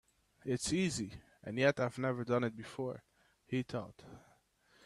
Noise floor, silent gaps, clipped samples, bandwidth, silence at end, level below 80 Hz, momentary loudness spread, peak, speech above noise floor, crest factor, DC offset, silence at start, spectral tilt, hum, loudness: -70 dBFS; none; under 0.1%; 13.5 kHz; 0.65 s; -66 dBFS; 19 LU; -16 dBFS; 34 dB; 22 dB; under 0.1%; 0.45 s; -5 dB/octave; none; -37 LUFS